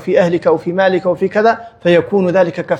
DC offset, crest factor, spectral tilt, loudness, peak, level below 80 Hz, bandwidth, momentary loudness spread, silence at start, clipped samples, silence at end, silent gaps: under 0.1%; 14 dB; -7 dB/octave; -14 LUFS; 0 dBFS; -56 dBFS; 9 kHz; 3 LU; 0 s; under 0.1%; 0 s; none